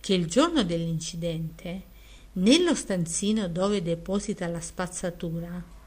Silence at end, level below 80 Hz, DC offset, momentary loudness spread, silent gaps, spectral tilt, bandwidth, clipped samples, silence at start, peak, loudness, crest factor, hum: 0 s; -48 dBFS; under 0.1%; 14 LU; none; -4.5 dB/octave; 15.5 kHz; under 0.1%; 0.05 s; -6 dBFS; -27 LUFS; 22 dB; none